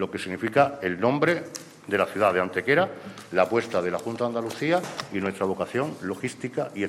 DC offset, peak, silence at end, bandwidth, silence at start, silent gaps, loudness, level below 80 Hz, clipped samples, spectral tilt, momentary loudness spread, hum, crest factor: under 0.1%; -6 dBFS; 0 s; 15.5 kHz; 0 s; none; -26 LUFS; -68 dBFS; under 0.1%; -5.5 dB/octave; 9 LU; none; 20 dB